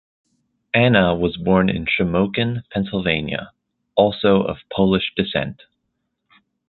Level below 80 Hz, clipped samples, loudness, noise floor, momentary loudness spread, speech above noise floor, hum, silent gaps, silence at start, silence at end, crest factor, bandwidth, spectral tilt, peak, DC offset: -44 dBFS; under 0.1%; -19 LUFS; -74 dBFS; 9 LU; 56 dB; none; none; 0.75 s; 1.15 s; 18 dB; 4.4 kHz; -10.5 dB/octave; -2 dBFS; under 0.1%